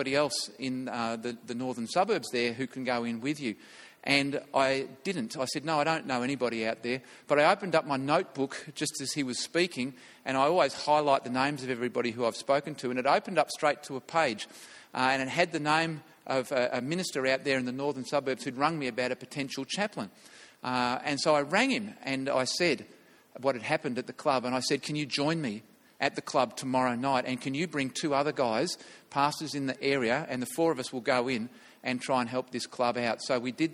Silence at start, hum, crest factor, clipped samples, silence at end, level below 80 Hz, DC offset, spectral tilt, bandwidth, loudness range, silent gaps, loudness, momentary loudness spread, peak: 0 s; none; 22 dB; under 0.1%; 0 s; -72 dBFS; under 0.1%; -4 dB/octave; 16 kHz; 2 LU; none; -30 LUFS; 9 LU; -8 dBFS